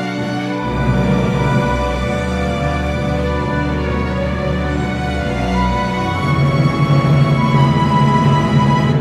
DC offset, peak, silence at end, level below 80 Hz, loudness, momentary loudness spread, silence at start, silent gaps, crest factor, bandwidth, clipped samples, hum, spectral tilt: under 0.1%; 0 dBFS; 0 s; -26 dBFS; -16 LUFS; 6 LU; 0 s; none; 14 dB; 10.5 kHz; under 0.1%; none; -7.5 dB/octave